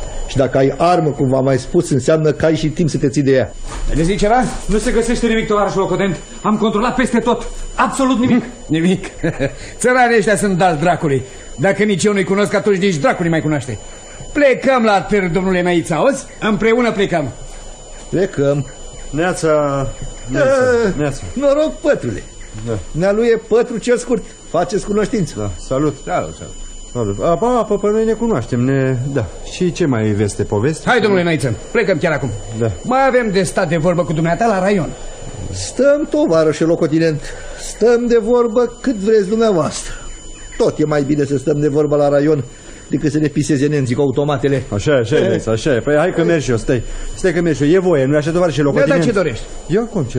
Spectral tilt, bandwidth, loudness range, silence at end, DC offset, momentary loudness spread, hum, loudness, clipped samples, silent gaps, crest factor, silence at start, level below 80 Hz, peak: -6 dB/octave; 13 kHz; 3 LU; 0 s; under 0.1%; 11 LU; none; -16 LUFS; under 0.1%; none; 14 dB; 0 s; -32 dBFS; 0 dBFS